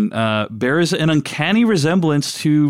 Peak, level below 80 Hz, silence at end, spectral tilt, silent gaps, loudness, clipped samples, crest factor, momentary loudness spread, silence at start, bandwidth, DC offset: -6 dBFS; -58 dBFS; 0 s; -5.5 dB/octave; none; -17 LUFS; under 0.1%; 10 dB; 4 LU; 0 s; 14 kHz; 0.2%